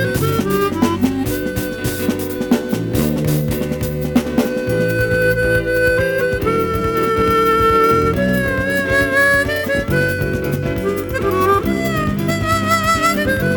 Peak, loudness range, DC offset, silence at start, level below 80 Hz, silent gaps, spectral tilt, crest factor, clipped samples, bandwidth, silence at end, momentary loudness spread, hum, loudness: -2 dBFS; 4 LU; under 0.1%; 0 s; -32 dBFS; none; -5.5 dB/octave; 14 dB; under 0.1%; over 20 kHz; 0 s; 7 LU; none; -16 LUFS